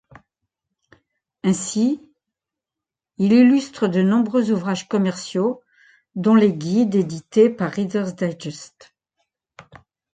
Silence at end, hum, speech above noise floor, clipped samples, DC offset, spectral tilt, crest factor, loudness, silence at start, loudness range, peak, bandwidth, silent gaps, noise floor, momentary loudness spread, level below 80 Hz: 1.5 s; none; 69 dB; under 0.1%; under 0.1%; -6.5 dB/octave; 18 dB; -19 LUFS; 1.45 s; 4 LU; -4 dBFS; 9.4 kHz; none; -87 dBFS; 11 LU; -64 dBFS